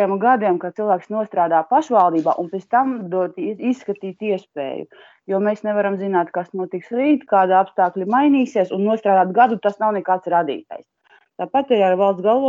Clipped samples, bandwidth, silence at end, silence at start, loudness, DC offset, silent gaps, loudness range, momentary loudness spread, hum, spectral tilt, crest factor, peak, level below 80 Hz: under 0.1%; 7.6 kHz; 0 s; 0 s; -19 LUFS; under 0.1%; none; 6 LU; 11 LU; none; -7.5 dB/octave; 16 dB; -2 dBFS; -72 dBFS